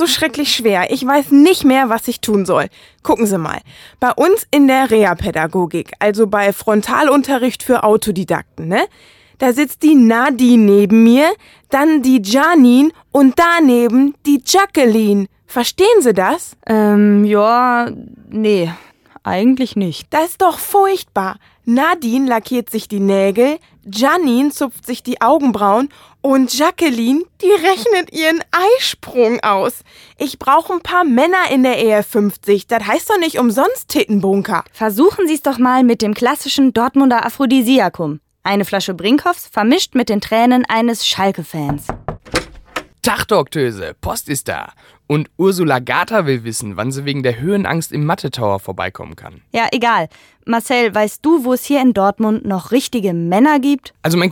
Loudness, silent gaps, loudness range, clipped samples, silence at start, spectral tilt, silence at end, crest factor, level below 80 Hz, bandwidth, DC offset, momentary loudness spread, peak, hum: -14 LUFS; none; 6 LU; under 0.1%; 0 s; -5 dB/octave; 0 s; 14 dB; -48 dBFS; 18.5 kHz; under 0.1%; 11 LU; 0 dBFS; none